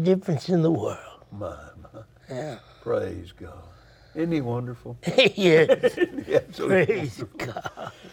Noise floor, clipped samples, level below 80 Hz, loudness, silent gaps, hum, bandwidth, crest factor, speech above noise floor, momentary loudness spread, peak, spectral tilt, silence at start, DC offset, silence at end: -46 dBFS; under 0.1%; -58 dBFS; -24 LUFS; none; none; 16 kHz; 20 dB; 22 dB; 21 LU; -4 dBFS; -6 dB/octave; 0 s; under 0.1%; 0.05 s